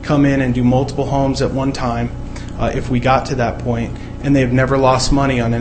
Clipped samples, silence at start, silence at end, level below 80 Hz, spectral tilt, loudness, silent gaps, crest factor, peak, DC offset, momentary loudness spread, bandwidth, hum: under 0.1%; 0 s; 0 s; -28 dBFS; -6.5 dB/octave; -16 LUFS; none; 16 dB; 0 dBFS; under 0.1%; 9 LU; 8.8 kHz; 60 Hz at -30 dBFS